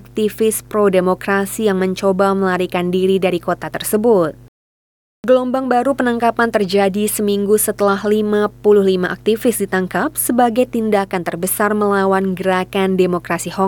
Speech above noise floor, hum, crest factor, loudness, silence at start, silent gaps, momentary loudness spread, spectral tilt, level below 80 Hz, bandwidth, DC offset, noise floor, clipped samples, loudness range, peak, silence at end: over 74 dB; none; 14 dB; -16 LUFS; 0.15 s; 4.48-5.23 s; 5 LU; -5 dB/octave; -48 dBFS; 19.5 kHz; under 0.1%; under -90 dBFS; under 0.1%; 2 LU; -2 dBFS; 0 s